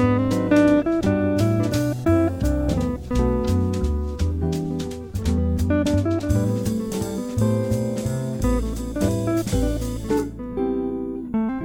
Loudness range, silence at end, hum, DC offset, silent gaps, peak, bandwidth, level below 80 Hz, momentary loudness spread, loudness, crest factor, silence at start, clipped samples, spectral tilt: 4 LU; 0 s; none; under 0.1%; none; -6 dBFS; 17.5 kHz; -30 dBFS; 7 LU; -23 LUFS; 16 dB; 0 s; under 0.1%; -7 dB/octave